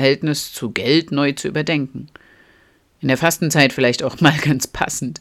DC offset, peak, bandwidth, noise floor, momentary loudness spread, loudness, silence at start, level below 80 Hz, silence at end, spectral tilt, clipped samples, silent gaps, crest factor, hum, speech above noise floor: under 0.1%; 0 dBFS; 16 kHz; -55 dBFS; 8 LU; -18 LUFS; 0 s; -50 dBFS; 0.05 s; -4.5 dB/octave; under 0.1%; none; 18 dB; none; 37 dB